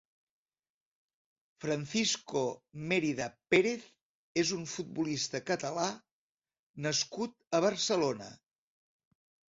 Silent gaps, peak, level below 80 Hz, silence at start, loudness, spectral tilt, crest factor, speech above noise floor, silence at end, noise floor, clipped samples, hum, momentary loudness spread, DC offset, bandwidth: 4.01-4.35 s, 6.12-6.38 s, 6.59-6.74 s; -12 dBFS; -74 dBFS; 1.6 s; -33 LUFS; -3.5 dB/octave; 22 dB; over 57 dB; 1.2 s; under -90 dBFS; under 0.1%; none; 11 LU; under 0.1%; 7.8 kHz